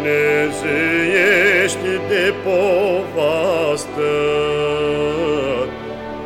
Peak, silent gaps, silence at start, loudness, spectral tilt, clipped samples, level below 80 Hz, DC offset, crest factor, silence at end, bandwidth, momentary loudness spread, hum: -2 dBFS; none; 0 s; -17 LUFS; -4.5 dB/octave; under 0.1%; -44 dBFS; under 0.1%; 14 dB; 0 s; 16 kHz; 7 LU; none